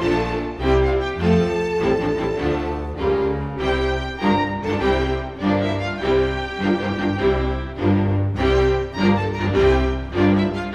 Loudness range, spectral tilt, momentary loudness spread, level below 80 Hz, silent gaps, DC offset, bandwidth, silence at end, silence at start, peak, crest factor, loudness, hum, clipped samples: 2 LU; -7.5 dB/octave; 5 LU; -30 dBFS; none; under 0.1%; 9.4 kHz; 0 s; 0 s; -4 dBFS; 16 dB; -20 LUFS; none; under 0.1%